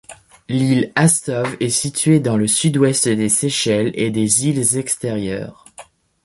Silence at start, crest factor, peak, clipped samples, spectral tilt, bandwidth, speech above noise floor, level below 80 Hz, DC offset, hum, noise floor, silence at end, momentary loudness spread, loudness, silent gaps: 0.1 s; 18 dB; 0 dBFS; under 0.1%; -4 dB/octave; 12 kHz; 26 dB; -52 dBFS; under 0.1%; none; -43 dBFS; 0.45 s; 8 LU; -17 LUFS; none